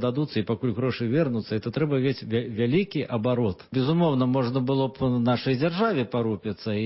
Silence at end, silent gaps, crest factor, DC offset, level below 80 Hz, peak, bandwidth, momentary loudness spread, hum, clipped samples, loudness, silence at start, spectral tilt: 0 s; none; 14 dB; under 0.1%; -54 dBFS; -12 dBFS; 5.8 kHz; 5 LU; none; under 0.1%; -25 LUFS; 0 s; -11.5 dB/octave